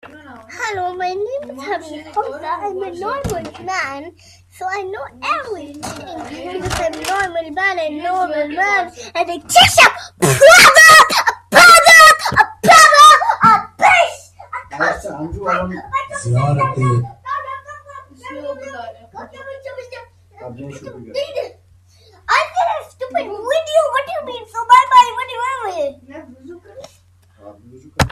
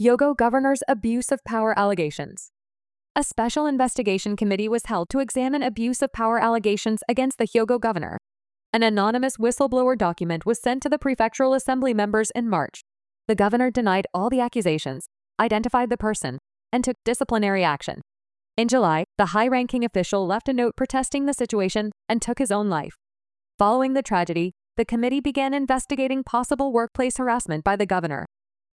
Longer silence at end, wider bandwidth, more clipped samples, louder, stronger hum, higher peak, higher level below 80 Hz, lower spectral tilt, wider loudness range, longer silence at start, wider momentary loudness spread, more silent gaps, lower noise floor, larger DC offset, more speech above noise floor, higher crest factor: second, 0 s vs 0.5 s; first, over 20 kHz vs 12 kHz; first, 0.1% vs under 0.1%; first, -11 LUFS vs -23 LUFS; neither; first, 0 dBFS vs -6 dBFS; first, -44 dBFS vs -50 dBFS; second, -2.5 dB/octave vs -5 dB/octave; first, 19 LU vs 2 LU; first, 0.3 s vs 0 s; first, 25 LU vs 8 LU; second, none vs 3.10-3.15 s, 8.66-8.73 s, 23.54-23.58 s; second, -51 dBFS vs under -90 dBFS; neither; second, 32 dB vs over 68 dB; about the same, 14 dB vs 16 dB